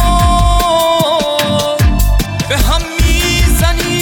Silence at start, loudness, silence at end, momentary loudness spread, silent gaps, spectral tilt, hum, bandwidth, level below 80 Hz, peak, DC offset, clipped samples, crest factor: 0 s; -12 LUFS; 0 s; 3 LU; none; -4.5 dB/octave; none; 18 kHz; -14 dBFS; 0 dBFS; under 0.1%; under 0.1%; 10 dB